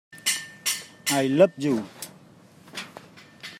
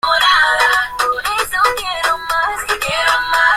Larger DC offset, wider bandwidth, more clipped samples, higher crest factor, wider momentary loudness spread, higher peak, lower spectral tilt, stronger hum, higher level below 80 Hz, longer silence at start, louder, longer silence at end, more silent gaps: neither; about the same, 16 kHz vs 16.5 kHz; neither; first, 24 dB vs 14 dB; first, 21 LU vs 7 LU; second, -4 dBFS vs 0 dBFS; first, -3.5 dB/octave vs 0 dB/octave; neither; second, -74 dBFS vs -42 dBFS; about the same, 0.15 s vs 0.05 s; second, -24 LUFS vs -14 LUFS; about the same, 0 s vs 0 s; neither